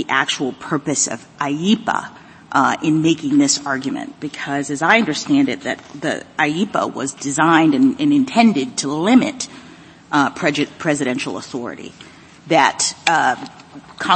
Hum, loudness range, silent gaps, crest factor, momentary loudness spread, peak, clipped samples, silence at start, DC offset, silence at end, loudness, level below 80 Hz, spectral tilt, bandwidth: none; 3 LU; none; 18 dB; 13 LU; 0 dBFS; under 0.1%; 0 s; under 0.1%; 0 s; -18 LUFS; -60 dBFS; -3.5 dB/octave; 8.8 kHz